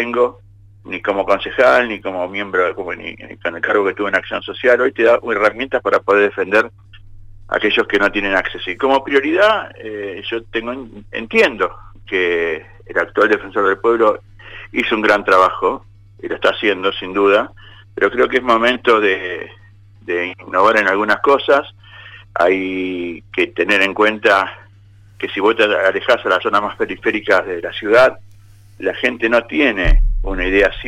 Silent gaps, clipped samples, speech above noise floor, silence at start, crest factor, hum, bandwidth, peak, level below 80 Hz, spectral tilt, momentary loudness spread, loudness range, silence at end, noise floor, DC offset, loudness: none; under 0.1%; 29 dB; 0 s; 14 dB; none; 12.5 kHz; -2 dBFS; -30 dBFS; -5 dB/octave; 13 LU; 2 LU; 0 s; -45 dBFS; under 0.1%; -16 LUFS